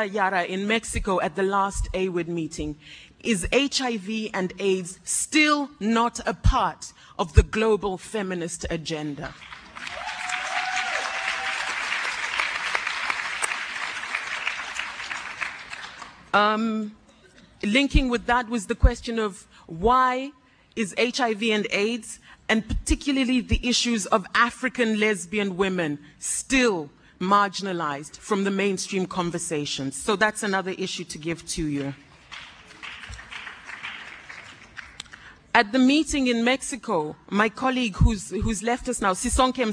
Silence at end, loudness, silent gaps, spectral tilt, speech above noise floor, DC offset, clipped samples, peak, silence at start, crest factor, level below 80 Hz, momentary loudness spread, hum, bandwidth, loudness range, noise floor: 0 s; -25 LUFS; none; -4 dB/octave; 29 dB; under 0.1%; under 0.1%; 0 dBFS; 0 s; 24 dB; -34 dBFS; 16 LU; none; 10.5 kHz; 5 LU; -53 dBFS